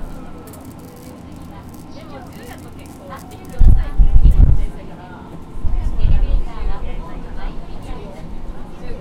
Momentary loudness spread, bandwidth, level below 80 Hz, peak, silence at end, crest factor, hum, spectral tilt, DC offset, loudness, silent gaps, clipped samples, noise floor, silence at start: 20 LU; 4.7 kHz; -18 dBFS; 0 dBFS; 0 s; 16 dB; none; -7.5 dB/octave; under 0.1%; -20 LUFS; none; 0.2%; -35 dBFS; 0 s